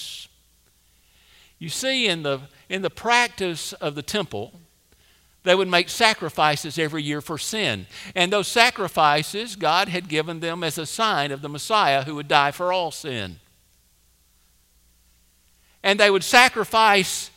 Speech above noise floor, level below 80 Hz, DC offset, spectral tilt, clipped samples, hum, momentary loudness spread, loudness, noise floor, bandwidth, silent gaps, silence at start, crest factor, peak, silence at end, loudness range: 39 dB; -60 dBFS; under 0.1%; -3 dB/octave; under 0.1%; none; 13 LU; -21 LUFS; -60 dBFS; 16.5 kHz; none; 0 s; 24 dB; 0 dBFS; 0.1 s; 5 LU